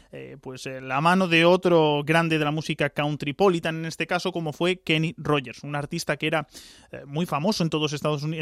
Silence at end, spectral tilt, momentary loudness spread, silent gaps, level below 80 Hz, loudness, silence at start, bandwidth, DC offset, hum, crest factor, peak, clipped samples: 0 s; -5.5 dB/octave; 16 LU; none; -60 dBFS; -24 LUFS; 0.15 s; 14.5 kHz; under 0.1%; none; 18 dB; -6 dBFS; under 0.1%